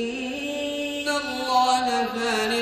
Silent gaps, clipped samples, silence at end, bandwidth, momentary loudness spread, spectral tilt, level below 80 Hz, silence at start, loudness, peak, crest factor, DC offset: none; under 0.1%; 0 s; 14.5 kHz; 8 LU; -2 dB/octave; -58 dBFS; 0 s; -24 LUFS; -10 dBFS; 14 dB; under 0.1%